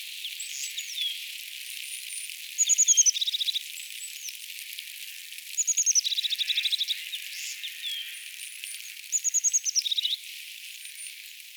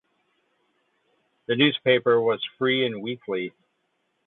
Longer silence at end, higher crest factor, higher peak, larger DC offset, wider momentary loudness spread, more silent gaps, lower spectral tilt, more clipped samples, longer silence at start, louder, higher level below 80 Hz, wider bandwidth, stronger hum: second, 0 s vs 0.75 s; about the same, 20 dB vs 20 dB; second, -10 dBFS vs -6 dBFS; neither; first, 17 LU vs 12 LU; neither; second, 14 dB/octave vs -9 dB/octave; neither; second, 0 s vs 1.5 s; second, -26 LUFS vs -23 LUFS; second, under -90 dBFS vs -74 dBFS; first, over 20 kHz vs 4.2 kHz; neither